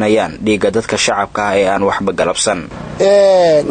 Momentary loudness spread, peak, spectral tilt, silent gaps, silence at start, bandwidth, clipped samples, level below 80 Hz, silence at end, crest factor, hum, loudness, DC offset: 7 LU; -2 dBFS; -4 dB/octave; none; 0 s; 9.6 kHz; under 0.1%; -42 dBFS; 0 s; 12 dB; none; -13 LUFS; under 0.1%